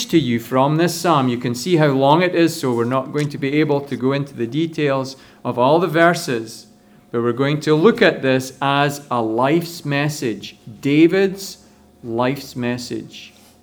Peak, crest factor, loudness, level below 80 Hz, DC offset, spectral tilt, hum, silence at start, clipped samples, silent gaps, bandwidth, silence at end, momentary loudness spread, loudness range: 0 dBFS; 18 dB; -18 LUFS; -60 dBFS; under 0.1%; -5.5 dB/octave; none; 0 s; under 0.1%; none; over 20 kHz; 0.35 s; 13 LU; 3 LU